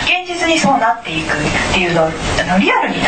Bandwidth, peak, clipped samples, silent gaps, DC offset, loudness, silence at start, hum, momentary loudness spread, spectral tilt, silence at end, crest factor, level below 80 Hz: 9.2 kHz; -2 dBFS; under 0.1%; none; 0.6%; -14 LUFS; 0 s; none; 4 LU; -4 dB/octave; 0 s; 12 dB; -32 dBFS